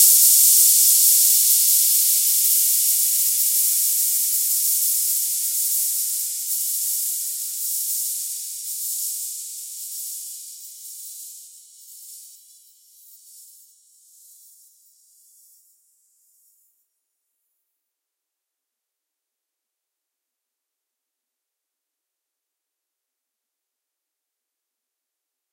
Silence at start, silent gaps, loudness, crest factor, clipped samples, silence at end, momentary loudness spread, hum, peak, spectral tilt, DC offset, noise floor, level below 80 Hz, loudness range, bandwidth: 0 s; none; -16 LUFS; 24 dB; under 0.1%; 12.1 s; 21 LU; none; 0 dBFS; 11.5 dB/octave; under 0.1%; -84 dBFS; under -90 dBFS; 21 LU; 16 kHz